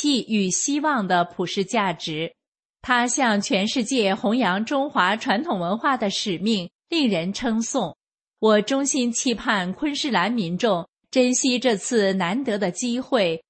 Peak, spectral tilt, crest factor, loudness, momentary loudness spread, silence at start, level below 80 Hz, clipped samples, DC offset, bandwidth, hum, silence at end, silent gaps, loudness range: -4 dBFS; -3.5 dB/octave; 18 dB; -22 LUFS; 6 LU; 0 s; -62 dBFS; under 0.1%; under 0.1%; 8.8 kHz; none; 0.1 s; 2.48-2.52 s, 2.65-2.74 s, 6.75-6.79 s, 10.89-10.93 s; 1 LU